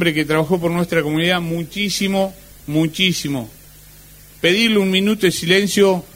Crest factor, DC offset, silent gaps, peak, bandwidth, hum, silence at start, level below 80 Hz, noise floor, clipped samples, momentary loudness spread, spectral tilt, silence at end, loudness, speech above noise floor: 18 dB; under 0.1%; none; 0 dBFS; 16.5 kHz; 50 Hz at -45 dBFS; 0 s; -48 dBFS; -43 dBFS; under 0.1%; 9 LU; -4.5 dB/octave; 0.1 s; -17 LUFS; 26 dB